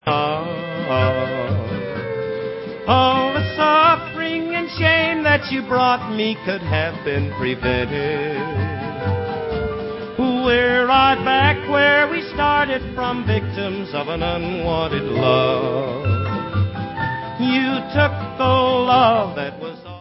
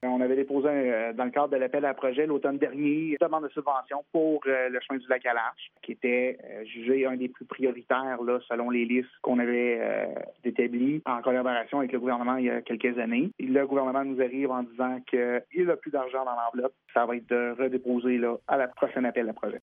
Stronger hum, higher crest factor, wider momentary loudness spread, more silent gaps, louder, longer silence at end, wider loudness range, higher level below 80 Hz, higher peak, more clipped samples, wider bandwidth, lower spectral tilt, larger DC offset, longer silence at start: neither; about the same, 18 dB vs 18 dB; first, 11 LU vs 5 LU; neither; first, -19 LUFS vs -28 LUFS; about the same, 0 s vs 0.05 s; first, 5 LU vs 2 LU; first, -38 dBFS vs -80 dBFS; first, -2 dBFS vs -10 dBFS; neither; first, 5.8 kHz vs 3.7 kHz; about the same, -10 dB/octave vs -9 dB/octave; neither; about the same, 0.05 s vs 0 s